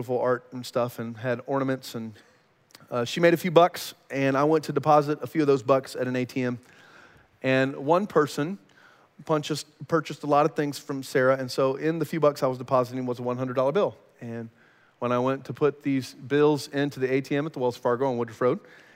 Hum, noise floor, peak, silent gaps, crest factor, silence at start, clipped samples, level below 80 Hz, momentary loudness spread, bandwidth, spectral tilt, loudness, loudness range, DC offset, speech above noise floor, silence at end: none; -57 dBFS; -4 dBFS; none; 22 dB; 0 s; under 0.1%; -74 dBFS; 11 LU; 16 kHz; -6 dB/octave; -26 LUFS; 4 LU; under 0.1%; 32 dB; 0.4 s